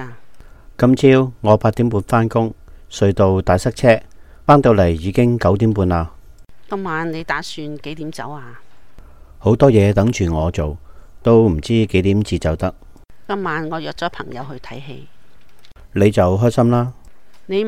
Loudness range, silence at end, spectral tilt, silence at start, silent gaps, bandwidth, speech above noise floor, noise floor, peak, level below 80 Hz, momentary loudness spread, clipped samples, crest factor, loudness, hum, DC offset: 9 LU; 0 s; -7.5 dB/octave; 0 s; none; 13.5 kHz; 37 dB; -52 dBFS; 0 dBFS; -36 dBFS; 17 LU; under 0.1%; 16 dB; -16 LUFS; none; under 0.1%